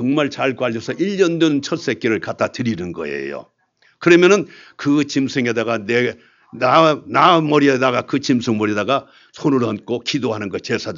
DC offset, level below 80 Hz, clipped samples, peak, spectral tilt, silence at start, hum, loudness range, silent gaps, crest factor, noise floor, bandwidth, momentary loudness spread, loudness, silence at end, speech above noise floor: under 0.1%; -62 dBFS; under 0.1%; 0 dBFS; -5.5 dB/octave; 0 s; none; 4 LU; none; 18 dB; -55 dBFS; 7.6 kHz; 11 LU; -17 LUFS; 0 s; 38 dB